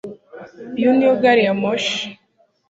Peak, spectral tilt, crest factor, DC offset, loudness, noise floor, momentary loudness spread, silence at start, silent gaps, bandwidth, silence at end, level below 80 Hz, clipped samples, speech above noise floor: -2 dBFS; -5 dB/octave; 18 dB; under 0.1%; -17 LUFS; -61 dBFS; 18 LU; 0.05 s; none; 8 kHz; 0.55 s; -62 dBFS; under 0.1%; 45 dB